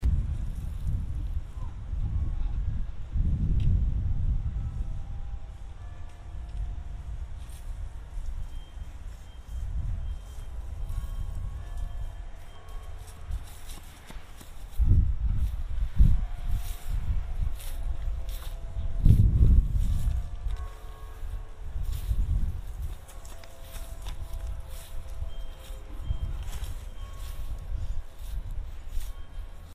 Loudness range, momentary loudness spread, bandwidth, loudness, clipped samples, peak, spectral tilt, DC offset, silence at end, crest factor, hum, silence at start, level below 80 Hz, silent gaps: 13 LU; 19 LU; 15 kHz; -33 LUFS; under 0.1%; -4 dBFS; -7 dB/octave; under 0.1%; 0 s; 24 dB; none; 0 s; -30 dBFS; none